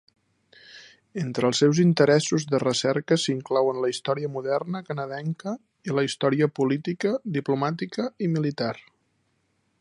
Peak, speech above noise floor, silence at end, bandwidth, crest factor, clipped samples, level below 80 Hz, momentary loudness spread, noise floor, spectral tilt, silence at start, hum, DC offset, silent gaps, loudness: -4 dBFS; 47 dB; 1 s; 11 kHz; 20 dB; under 0.1%; -72 dBFS; 11 LU; -71 dBFS; -5.5 dB/octave; 0.7 s; none; under 0.1%; none; -25 LUFS